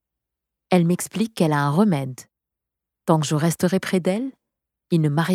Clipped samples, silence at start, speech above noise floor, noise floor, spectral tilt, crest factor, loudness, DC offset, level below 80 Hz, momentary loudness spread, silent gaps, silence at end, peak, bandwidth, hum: under 0.1%; 0.7 s; 64 dB; -84 dBFS; -6 dB/octave; 18 dB; -21 LUFS; under 0.1%; -66 dBFS; 9 LU; none; 0 s; -4 dBFS; 15.5 kHz; none